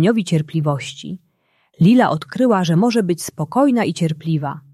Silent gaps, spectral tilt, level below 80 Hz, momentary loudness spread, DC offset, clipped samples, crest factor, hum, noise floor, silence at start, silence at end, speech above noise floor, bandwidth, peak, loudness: none; -6.5 dB/octave; -60 dBFS; 11 LU; under 0.1%; under 0.1%; 14 dB; none; -62 dBFS; 0 s; 0.15 s; 45 dB; 13.5 kHz; -2 dBFS; -17 LUFS